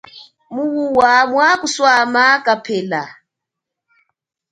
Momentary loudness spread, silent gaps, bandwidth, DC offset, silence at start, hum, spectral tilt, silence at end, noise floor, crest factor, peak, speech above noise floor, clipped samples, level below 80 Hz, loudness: 12 LU; none; 11 kHz; under 0.1%; 0.15 s; none; -3 dB/octave; 1.4 s; -82 dBFS; 16 dB; 0 dBFS; 67 dB; under 0.1%; -60 dBFS; -14 LUFS